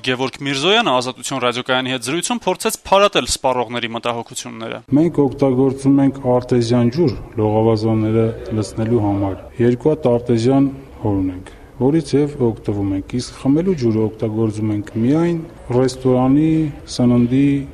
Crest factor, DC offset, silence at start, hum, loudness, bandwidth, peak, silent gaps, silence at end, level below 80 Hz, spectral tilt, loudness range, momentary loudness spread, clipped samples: 16 dB; under 0.1%; 0.05 s; none; -17 LUFS; 13.5 kHz; -2 dBFS; none; 0 s; -42 dBFS; -6 dB/octave; 3 LU; 8 LU; under 0.1%